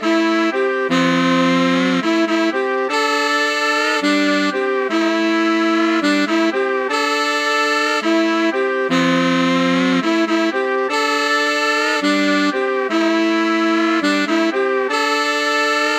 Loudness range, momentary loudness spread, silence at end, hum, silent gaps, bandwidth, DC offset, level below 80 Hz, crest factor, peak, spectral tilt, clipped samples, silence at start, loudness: 1 LU; 3 LU; 0 s; none; none; 15.5 kHz; under 0.1%; -68 dBFS; 14 dB; -2 dBFS; -4 dB/octave; under 0.1%; 0 s; -16 LUFS